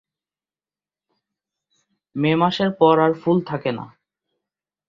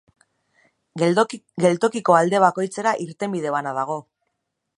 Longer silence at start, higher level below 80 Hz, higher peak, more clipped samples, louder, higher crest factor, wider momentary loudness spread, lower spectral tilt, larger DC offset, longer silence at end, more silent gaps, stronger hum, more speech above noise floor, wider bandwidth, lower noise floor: first, 2.15 s vs 0.95 s; first, -64 dBFS vs -72 dBFS; about the same, -2 dBFS vs -2 dBFS; neither; about the same, -19 LUFS vs -21 LUFS; about the same, 20 dB vs 20 dB; first, 17 LU vs 10 LU; first, -8 dB/octave vs -5.5 dB/octave; neither; first, 1 s vs 0.75 s; neither; neither; first, over 71 dB vs 57 dB; second, 7.2 kHz vs 11 kHz; first, under -90 dBFS vs -77 dBFS